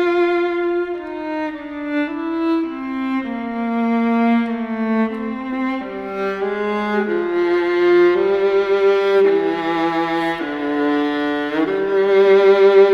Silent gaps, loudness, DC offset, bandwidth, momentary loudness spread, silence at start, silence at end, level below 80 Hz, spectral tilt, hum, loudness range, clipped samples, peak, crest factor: none; -18 LUFS; under 0.1%; 6.6 kHz; 11 LU; 0 s; 0 s; -56 dBFS; -6.5 dB/octave; none; 5 LU; under 0.1%; -2 dBFS; 16 dB